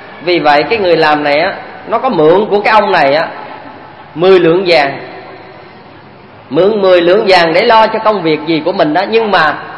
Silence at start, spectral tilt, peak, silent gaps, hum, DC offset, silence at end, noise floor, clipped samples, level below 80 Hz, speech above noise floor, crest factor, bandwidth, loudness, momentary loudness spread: 0 s; -6 dB/octave; 0 dBFS; none; none; under 0.1%; 0 s; -35 dBFS; 0.4%; -48 dBFS; 26 dB; 10 dB; 11 kHz; -9 LUFS; 12 LU